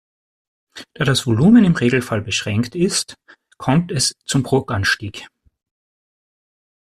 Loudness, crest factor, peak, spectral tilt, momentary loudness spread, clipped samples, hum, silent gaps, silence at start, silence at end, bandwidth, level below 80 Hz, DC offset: -17 LUFS; 16 dB; -2 dBFS; -5 dB/octave; 13 LU; under 0.1%; none; none; 0.75 s; 1.65 s; 14 kHz; -48 dBFS; under 0.1%